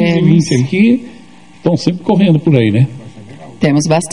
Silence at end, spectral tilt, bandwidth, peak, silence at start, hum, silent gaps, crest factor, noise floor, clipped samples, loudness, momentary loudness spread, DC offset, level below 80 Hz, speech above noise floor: 0 s; -6.5 dB/octave; 11 kHz; 0 dBFS; 0 s; none; none; 12 dB; -33 dBFS; 0.1%; -12 LUFS; 7 LU; 0.8%; -50 dBFS; 22 dB